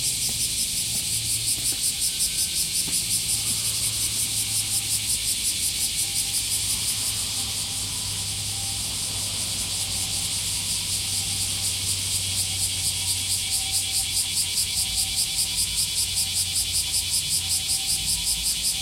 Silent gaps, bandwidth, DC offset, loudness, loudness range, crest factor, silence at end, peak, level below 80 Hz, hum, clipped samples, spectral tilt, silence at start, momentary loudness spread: none; 16.5 kHz; under 0.1%; -22 LUFS; 3 LU; 18 dB; 0 s; -8 dBFS; -46 dBFS; none; under 0.1%; 0 dB/octave; 0 s; 3 LU